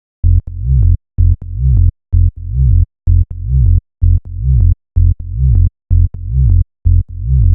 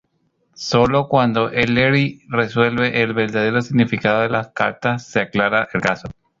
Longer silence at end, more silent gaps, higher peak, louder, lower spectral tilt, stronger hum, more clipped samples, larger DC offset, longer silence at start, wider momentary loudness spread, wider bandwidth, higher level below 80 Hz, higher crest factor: second, 0 s vs 0.3 s; neither; about the same, 0 dBFS vs 0 dBFS; first, -14 LUFS vs -18 LUFS; first, -16 dB/octave vs -6 dB/octave; neither; neither; neither; second, 0.25 s vs 0.6 s; second, 3 LU vs 6 LU; second, 0.6 kHz vs 7.6 kHz; first, -14 dBFS vs -48 dBFS; second, 10 dB vs 18 dB